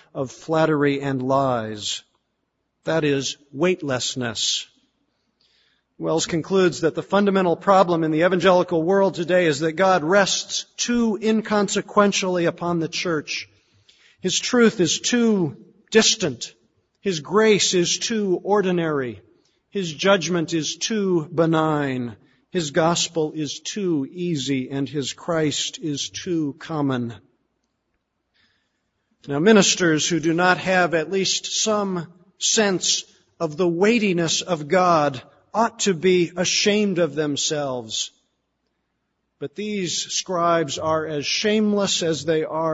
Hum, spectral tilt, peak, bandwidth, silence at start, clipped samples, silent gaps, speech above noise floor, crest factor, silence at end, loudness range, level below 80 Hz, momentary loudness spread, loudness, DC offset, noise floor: none; -3.5 dB/octave; -2 dBFS; 8 kHz; 0.15 s; under 0.1%; none; 53 dB; 20 dB; 0 s; 6 LU; -62 dBFS; 10 LU; -21 LUFS; under 0.1%; -74 dBFS